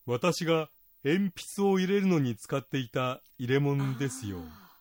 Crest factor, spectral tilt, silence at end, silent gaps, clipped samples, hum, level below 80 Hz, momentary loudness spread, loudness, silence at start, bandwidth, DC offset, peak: 16 dB; -6 dB/octave; 0.2 s; none; under 0.1%; none; -66 dBFS; 12 LU; -30 LUFS; 0.05 s; 16.5 kHz; under 0.1%; -14 dBFS